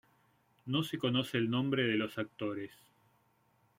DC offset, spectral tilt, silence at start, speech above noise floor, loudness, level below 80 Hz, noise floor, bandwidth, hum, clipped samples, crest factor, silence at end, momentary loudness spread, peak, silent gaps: under 0.1%; -6 dB/octave; 0.65 s; 38 dB; -34 LUFS; -74 dBFS; -72 dBFS; 16.5 kHz; none; under 0.1%; 18 dB; 1.05 s; 11 LU; -18 dBFS; none